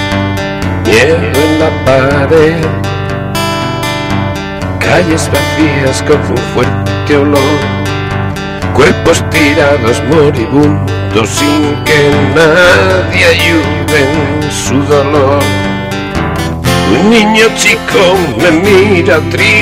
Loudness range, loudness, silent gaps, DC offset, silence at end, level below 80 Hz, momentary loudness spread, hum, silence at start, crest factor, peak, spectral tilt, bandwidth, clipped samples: 4 LU; -9 LUFS; none; under 0.1%; 0 s; -30 dBFS; 8 LU; none; 0 s; 8 dB; 0 dBFS; -5 dB/octave; 16.5 kHz; 0.3%